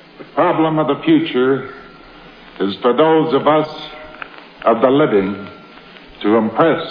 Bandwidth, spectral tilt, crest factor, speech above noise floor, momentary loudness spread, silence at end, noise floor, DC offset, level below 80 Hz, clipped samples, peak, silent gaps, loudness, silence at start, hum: 5.2 kHz; -9 dB/octave; 16 dB; 25 dB; 19 LU; 0 s; -40 dBFS; under 0.1%; -54 dBFS; under 0.1%; 0 dBFS; none; -15 LUFS; 0.2 s; none